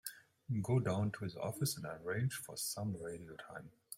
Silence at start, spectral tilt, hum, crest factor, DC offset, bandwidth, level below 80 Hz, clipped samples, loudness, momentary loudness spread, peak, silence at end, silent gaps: 0.05 s; -5 dB/octave; none; 18 dB; under 0.1%; 16.5 kHz; -72 dBFS; under 0.1%; -40 LUFS; 15 LU; -24 dBFS; 0 s; none